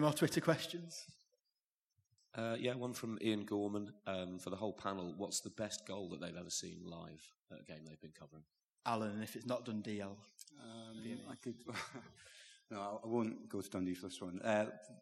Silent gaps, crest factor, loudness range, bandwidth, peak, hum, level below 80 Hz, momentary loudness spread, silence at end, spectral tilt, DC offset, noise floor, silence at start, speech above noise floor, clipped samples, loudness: 1.60-1.90 s, 7.40-7.44 s, 8.64-8.76 s; 26 dB; 5 LU; 13.5 kHz; -18 dBFS; none; -84 dBFS; 19 LU; 0 s; -4.5 dB/octave; under 0.1%; under -90 dBFS; 0 s; over 48 dB; under 0.1%; -42 LUFS